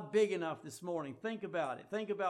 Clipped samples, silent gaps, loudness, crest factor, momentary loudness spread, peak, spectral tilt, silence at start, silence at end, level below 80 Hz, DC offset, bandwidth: under 0.1%; none; -38 LUFS; 18 dB; 9 LU; -20 dBFS; -5 dB/octave; 0 s; 0 s; -82 dBFS; under 0.1%; 13.5 kHz